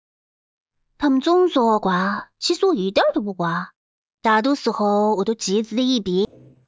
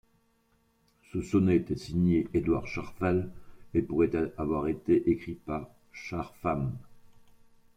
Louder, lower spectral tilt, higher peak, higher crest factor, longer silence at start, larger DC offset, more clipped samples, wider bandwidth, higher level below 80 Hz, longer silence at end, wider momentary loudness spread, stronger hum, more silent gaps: first, -20 LUFS vs -30 LUFS; second, -5 dB/octave vs -8.5 dB/octave; first, -4 dBFS vs -14 dBFS; about the same, 16 dB vs 18 dB; second, 1 s vs 1.15 s; neither; neither; second, 8 kHz vs 9.6 kHz; second, -60 dBFS vs -52 dBFS; second, 0.45 s vs 0.75 s; second, 7 LU vs 12 LU; neither; first, 3.76-4.18 s vs none